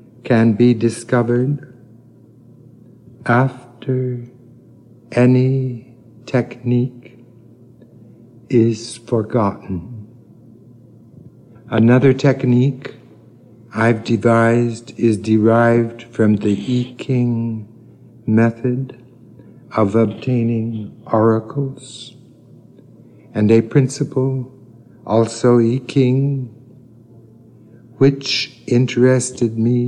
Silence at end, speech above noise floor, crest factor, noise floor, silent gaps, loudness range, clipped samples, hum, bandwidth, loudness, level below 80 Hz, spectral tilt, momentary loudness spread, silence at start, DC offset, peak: 0 s; 30 dB; 16 dB; -45 dBFS; none; 6 LU; under 0.1%; none; 11 kHz; -17 LUFS; -58 dBFS; -7 dB/octave; 14 LU; 0.25 s; under 0.1%; -2 dBFS